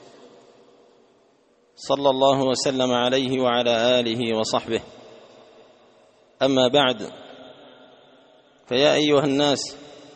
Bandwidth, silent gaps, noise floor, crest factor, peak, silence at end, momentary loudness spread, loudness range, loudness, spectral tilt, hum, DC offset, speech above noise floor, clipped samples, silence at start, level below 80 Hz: 8.8 kHz; none; -60 dBFS; 20 dB; -4 dBFS; 0.15 s; 14 LU; 4 LU; -21 LUFS; -4 dB/octave; none; under 0.1%; 40 dB; under 0.1%; 1.8 s; -62 dBFS